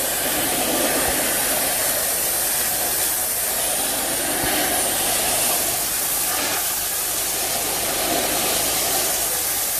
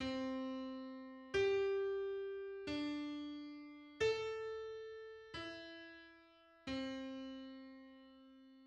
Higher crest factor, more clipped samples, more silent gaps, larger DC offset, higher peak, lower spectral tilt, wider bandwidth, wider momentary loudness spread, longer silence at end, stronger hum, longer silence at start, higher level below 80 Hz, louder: about the same, 14 dB vs 18 dB; neither; neither; neither; first, -6 dBFS vs -26 dBFS; second, -0.5 dB/octave vs -5 dB/octave; first, 15.5 kHz vs 9.2 kHz; second, 2 LU vs 19 LU; about the same, 0 s vs 0 s; neither; about the same, 0 s vs 0 s; first, -46 dBFS vs -70 dBFS; first, -19 LUFS vs -43 LUFS